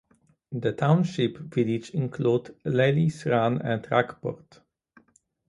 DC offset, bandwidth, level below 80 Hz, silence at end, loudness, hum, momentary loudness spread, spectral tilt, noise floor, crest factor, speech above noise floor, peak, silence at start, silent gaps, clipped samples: under 0.1%; 11 kHz; -62 dBFS; 1.15 s; -26 LUFS; none; 9 LU; -7.5 dB/octave; -64 dBFS; 20 dB; 39 dB; -6 dBFS; 0.5 s; none; under 0.1%